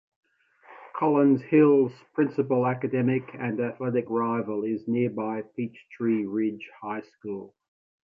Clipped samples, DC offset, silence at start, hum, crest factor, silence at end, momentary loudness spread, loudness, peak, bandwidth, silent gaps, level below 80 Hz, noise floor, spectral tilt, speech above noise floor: under 0.1%; under 0.1%; 0.7 s; none; 18 dB; 0.6 s; 15 LU; -26 LUFS; -8 dBFS; 5 kHz; none; -72 dBFS; -56 dBFS; -10.5 dB/octave; 30 dB